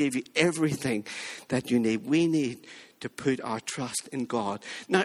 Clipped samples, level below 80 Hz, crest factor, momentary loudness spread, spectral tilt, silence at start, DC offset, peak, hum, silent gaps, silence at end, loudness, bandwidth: under 0.1%; -68 dBFS; 22 dB; 12 LU; -4.5 dB/octave; 0 s; under 0.1%; -6 dBFS; none; none; 0 s; -29 LUFS; 15 kHz